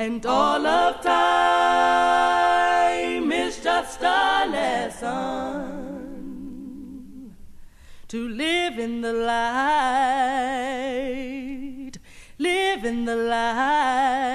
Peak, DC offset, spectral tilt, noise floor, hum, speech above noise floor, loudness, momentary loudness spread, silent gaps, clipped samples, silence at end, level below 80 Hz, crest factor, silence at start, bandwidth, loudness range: -6 dBFS; under 0.1%; -3 dB/octave; -43 dBFS; none; 20 dB; -22 LUFS; 18 LU; none; under 0.1%; 0 s; -52 dBFS; 16 dB; 0 s; 13.5 kHz; 11 LU